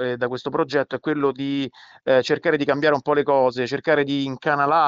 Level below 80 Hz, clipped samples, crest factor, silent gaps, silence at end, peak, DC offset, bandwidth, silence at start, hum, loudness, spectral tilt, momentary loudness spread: -64 dBFS; under 0.1%; 16 dB; none; 0 s; -6 dBFS; under 0.1%; 7.8 kHz; 0 s; none; -21 LUFS; -6 dB/octave; 7 LU